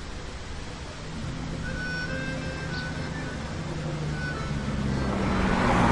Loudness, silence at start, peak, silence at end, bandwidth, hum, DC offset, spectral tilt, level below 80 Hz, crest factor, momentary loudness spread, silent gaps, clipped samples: -30 LUFS; 0 s; -10 dBFS; 0 s; 11.5 kHz; none; under 0.1%; -6 dB/octave; -38 dBFS; 20 dB; 13 LU; none; under 0.1%